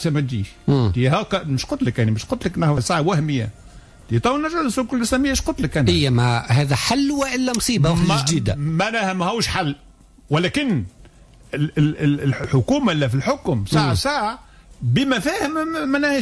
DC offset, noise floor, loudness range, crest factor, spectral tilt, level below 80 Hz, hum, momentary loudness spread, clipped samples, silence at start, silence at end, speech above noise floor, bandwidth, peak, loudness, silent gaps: under 0.1%; -46 dBFS; 4 LU; 14 dB; -5.5 dB/octave; -40 dBFS; none; 6 LU; under 0.1%; 0 s; 0 s; 27 dB; 11 kHz; -6 dBFS; -20 LUFS; none